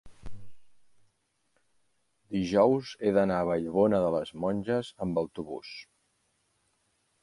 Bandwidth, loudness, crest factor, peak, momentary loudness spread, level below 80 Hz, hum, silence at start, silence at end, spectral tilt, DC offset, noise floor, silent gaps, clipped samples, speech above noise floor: 11.5 kHz; -28 LUFS; 22 dB; -10 dBFS; 15 LU; -58 dBFS; none; 0.05 s; 1.4 s; -7 dB/octave; under 0.1%; -75 dBFS; none; under 0.1%; 48 dB